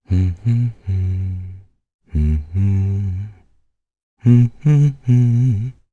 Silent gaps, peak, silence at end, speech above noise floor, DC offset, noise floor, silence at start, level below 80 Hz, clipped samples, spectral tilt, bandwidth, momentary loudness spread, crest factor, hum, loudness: 1.94-1.99 s, 4.03-4.17 s; -2 dBFS; 0.2 s; 47 dB; under 0.1%; -62 dBFS; 0.1 s; -30 dBFS; under 0.1%; -10 dB/octave; 7 kHz; 13 LU; 16 dB; none; -18 LUFS